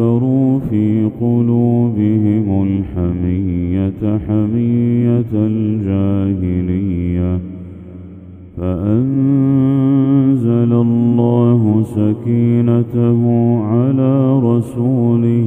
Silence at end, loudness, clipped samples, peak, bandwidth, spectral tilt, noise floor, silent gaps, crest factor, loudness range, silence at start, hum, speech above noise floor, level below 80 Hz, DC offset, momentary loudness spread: 0 s; -14 LUFS; under 0.1%; 0 dBFS; 3.6 kHz; -11.5 dB/octave; -34 dBFS; none; 14 dB; 5 LU; 0 s; none; 21 dB; -40 dBFS; under 0.1%; 6 LU